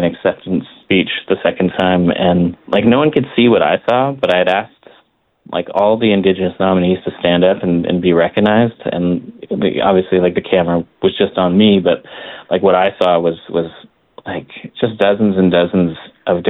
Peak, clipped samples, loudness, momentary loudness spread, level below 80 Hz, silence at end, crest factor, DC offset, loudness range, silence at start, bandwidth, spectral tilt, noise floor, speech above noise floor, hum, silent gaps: 0 dBFS; under 0.1%; -14 LUFS; 9 LU; -52 dBFS; 0 s; 14 dB; under 0.1%; 2 LU; 0 s; 4.6 kHz; -8.5 dB/octave; -55 dBFS; 41 dB; none; none